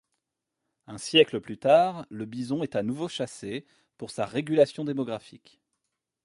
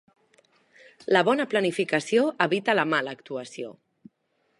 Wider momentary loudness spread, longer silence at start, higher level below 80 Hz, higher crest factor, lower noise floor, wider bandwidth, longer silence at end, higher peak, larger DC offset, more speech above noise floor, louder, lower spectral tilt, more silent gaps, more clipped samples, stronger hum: about the same, 17 LU vs 16 LU; second, 0.9 s vs 1.1 s; first, -70 dBFS vs -80 dBFS; about the same, 22 dB vs 22 dB; first, -84 dBFS vs -72 dBFS; about the same, 11.5 kHz vs 11.5 kHz; about the same, 0.9 s vs 0.9 s; about the same, -6 dBFS vs -4 dBFS; neither; first, 57 dB vs 47 dB; about the same, -26 LUFS vs -24 LUFS; about the same, -5 dB/octave vs -4.5 dB/octave; neither; neither; neither